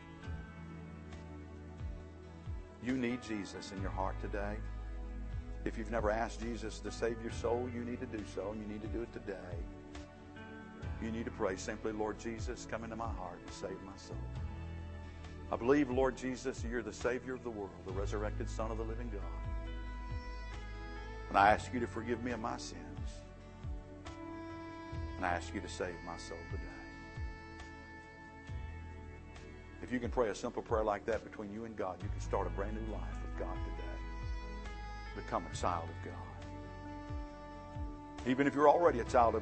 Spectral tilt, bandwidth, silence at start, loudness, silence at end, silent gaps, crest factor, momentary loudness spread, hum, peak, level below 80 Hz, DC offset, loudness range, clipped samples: -6 dB/octave; 8.4 kHz; 0 s; -39 LUFS; 0 s; none; 26 dB; 15 LU; none; -12 dBFS; -48 dBFS; under 0.1%; 8 LU; under 0.1%